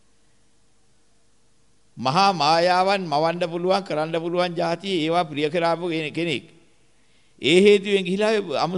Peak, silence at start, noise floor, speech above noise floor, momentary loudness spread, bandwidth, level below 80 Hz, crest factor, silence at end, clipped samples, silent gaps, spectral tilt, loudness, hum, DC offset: -4 dBFS; 1.95 s; -64 dBFS; 43 dB; 9 LU; 11.5 kHz; -68 dBFS; 18 dB; 0 s; under 0.1%; none; -5 dB/octave; -21 LUFS; none; 0.1%